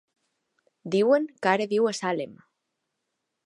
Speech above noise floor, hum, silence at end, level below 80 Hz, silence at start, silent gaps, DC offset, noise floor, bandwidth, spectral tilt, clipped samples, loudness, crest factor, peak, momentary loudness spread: 57 dB; none; 1.1 s; -78 dBFS; 0.85 s; none; under 0.1%; -81 dBFS; 11.5 kHz; -5 dB/octave; under 0.1%; -25 LUFS; 20 dB; -6 dBFS; 13 LU